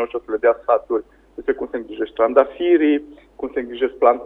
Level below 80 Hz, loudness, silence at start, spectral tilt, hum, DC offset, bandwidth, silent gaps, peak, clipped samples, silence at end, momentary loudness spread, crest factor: -54 dBFS; -20 LUFS; 0 s; -7 dB/octave; none; under 0.1%; 3.9 kHz; none; 0 dBFS; under 0.1%; 0 s; 11 LU; 18 dB